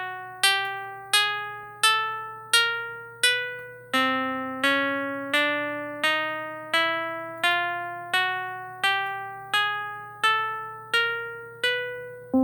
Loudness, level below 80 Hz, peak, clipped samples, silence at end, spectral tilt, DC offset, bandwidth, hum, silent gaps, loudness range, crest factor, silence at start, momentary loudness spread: -25 LUFS; -72 dBFS; -8 dBFS; under 0.1%; 0 s; -1 dB/octave; under 0.1%; over 20 kHz; none; none; 2 LU; 20 dB; 0 s; 13 LU